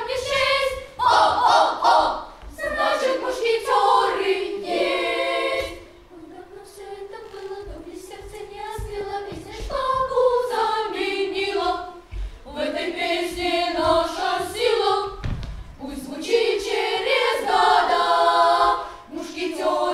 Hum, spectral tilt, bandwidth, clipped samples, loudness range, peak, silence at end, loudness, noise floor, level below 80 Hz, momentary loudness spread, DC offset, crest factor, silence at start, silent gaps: none; -3.5 dB/octave; 15.5 kHz; under 0.1%; 11 LU; -6 dBFS; 0 s; -21 LUFS; -43 dBFS; -42 dBFS; 19 LU; under 0.1%; 16 dB; 0 s; none